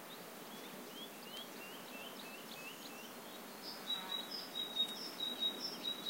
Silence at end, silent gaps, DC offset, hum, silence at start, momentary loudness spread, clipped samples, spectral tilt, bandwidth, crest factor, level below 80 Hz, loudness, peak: 0 s; none; under 0.1%; none; 0 s; 12 LU; under 0.1%; -1.5 dB/octave; 16 kHz; 18 dB; under -90 dBFS; -43 LUFS; -26 dBFS